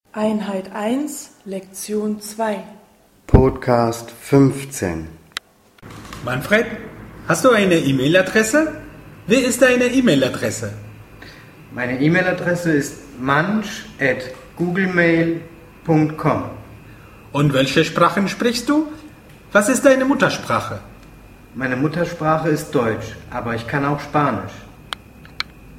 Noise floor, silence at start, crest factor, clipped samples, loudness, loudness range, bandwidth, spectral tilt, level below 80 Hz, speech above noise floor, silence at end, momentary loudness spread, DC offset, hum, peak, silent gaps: -48 dBFS; 0.15 s; 20 dB; under 0.1%; -18 LUFS; 5 LU; 16 kHz; -5.5 dB/octave; -36 dBFS; 30 dB; 0 s; 17 LU; under 0.1%; none; 0 dBFS; none